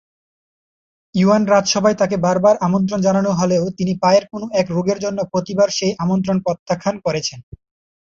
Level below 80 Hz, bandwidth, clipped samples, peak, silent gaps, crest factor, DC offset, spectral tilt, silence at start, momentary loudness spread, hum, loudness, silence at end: -54 dBFS; 7.6 kHz; under 0.1%; -2 dBFS; 6.59-6.66 s; 16 dB; under 0.1%; -5.5 dB/octave; 1.15 s; 7 LU; none; -17 LUFS; 0.6 s